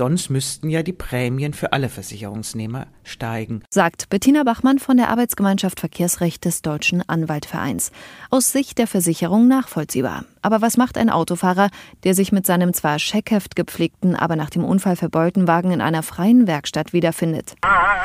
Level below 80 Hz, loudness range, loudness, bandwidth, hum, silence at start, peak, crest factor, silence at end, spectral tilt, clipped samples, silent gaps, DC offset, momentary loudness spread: -48 dBFS; 3 LU; -19 LUFS; 16 kHz; none; 0 s; 0 dBFS; 18 dB; 0 s; -5 dB/octave; under 0.1%; none; under 0.1%; 10 LU